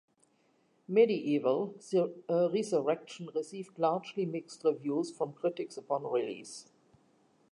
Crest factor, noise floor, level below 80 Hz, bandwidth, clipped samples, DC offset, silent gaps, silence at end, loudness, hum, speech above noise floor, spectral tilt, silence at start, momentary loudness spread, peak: 20 dB; -71 dBFS; -88 dBFS; 11.5 kHz; under 0.1%; under 0.1%; none; 0.9 s; -32 LUFS; none; 39 dB; -6 dB/octave; 0.9 s; 11 LU; -12 dBFS